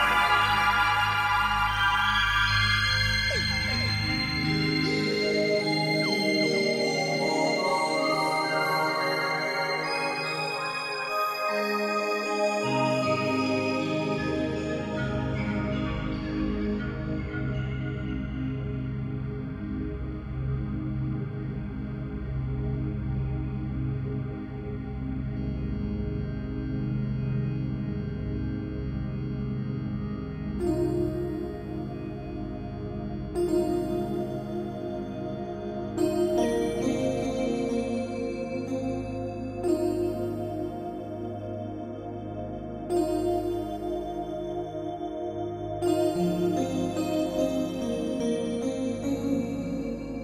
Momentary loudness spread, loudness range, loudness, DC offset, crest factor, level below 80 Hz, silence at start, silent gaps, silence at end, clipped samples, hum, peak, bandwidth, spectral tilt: 11 LU; 8 LU; -28 LUFS; under 0.1%; 18 dB; -42 dBFS; 0 s; none; 0 s; under 0.1%; none; -10 dBFS; 16 kHz; -5.5 dB/octave